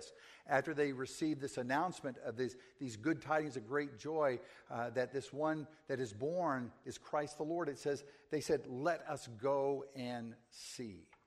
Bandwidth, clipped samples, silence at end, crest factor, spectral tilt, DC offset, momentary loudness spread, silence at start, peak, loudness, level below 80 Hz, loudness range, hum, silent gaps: 13.5 kHz; under 0.1%; 0.25 s; 22 dB; -5.5 dB/octave; under 0.1%; 11 LU; 0 s; -18 dBFS; -40 LUFS; -76 dBFS; 1 LU; none; none